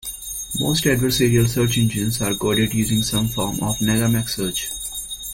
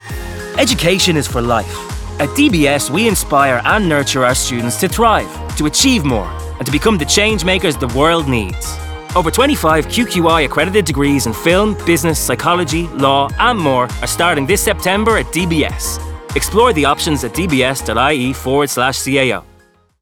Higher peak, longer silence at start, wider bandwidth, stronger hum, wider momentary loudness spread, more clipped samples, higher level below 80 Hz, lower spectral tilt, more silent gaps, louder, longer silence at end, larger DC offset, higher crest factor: second, -4 dBFS vs 0 dBFS; about the same, 0.05 s vs 0.05 s; second, 16.5 kHz vs 19.5 kHz; neither; about the same, 9 LU vs 8 LU; neither; second, -40 dBFS vs -30 dBFS; about the same, -4.5 dB/octave vs -4 dB/octave; neither; second, -20 LUFS vs -14 LUFS; second, 0 s vs 0.6 s; neither; about the same, 16 dB vs 14 dB